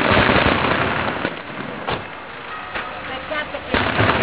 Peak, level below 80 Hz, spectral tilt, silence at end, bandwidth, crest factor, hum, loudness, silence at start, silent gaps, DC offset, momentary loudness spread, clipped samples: -4 dBFS; -36 dBFS; -9 dB/octave; 0 s; 4 kHz; 16 dB; none; -20 LUFS; 0 s; none; 0.4%; 15 LU; under 0.1%